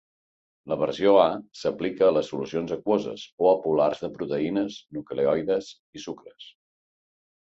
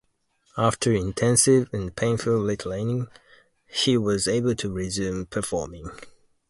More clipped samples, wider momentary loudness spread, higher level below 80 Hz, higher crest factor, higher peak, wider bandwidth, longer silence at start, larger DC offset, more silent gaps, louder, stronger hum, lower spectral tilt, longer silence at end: neither; first, 17 LU vs 12 LU; second, -64 dBFS vs -48 dBFS; about the same, 20 dB vs 20 dB; about the same, -6 dBFS vs -4 dBFS; second, 7.8 kHz vs 12 kHz; about the same, 0.65 s vs 0.55 s; neither; first, 3.32-3.38 s, 5.79-5.93 s vs none; about the same, -25 LUFS vs -24 LUFS; neither; first, -6 dB/octave vs -4.5 dB/octave; first, 1.05 s vs 0.4 s